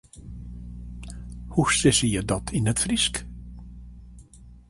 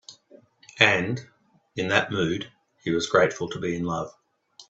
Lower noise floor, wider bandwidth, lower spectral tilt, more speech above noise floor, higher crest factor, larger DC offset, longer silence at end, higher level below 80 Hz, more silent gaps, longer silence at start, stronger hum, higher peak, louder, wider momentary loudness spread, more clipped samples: second, -48 dBFS vs -55 dBFS; first, 11.5 kHz vs 8.2 kHz; about the same, -3.5 dB/octave vs -4.5 dB/octave; second, 25 dB vs 31 dB; second, 20 dB vs 26 dB; neither; about the same, 0.1 s vs 0.05 s; first, -40 dBFS vs -62 dBFS; neither; about the same, 0.15 s vs 0.1 s; first, 60 Hz at -40 dBFS vs none; second, -6 dBFS vs -2 dBFS; about the same, -23 LUFS vs -24 LUFS; first, 24 LU vs 16 LU; neither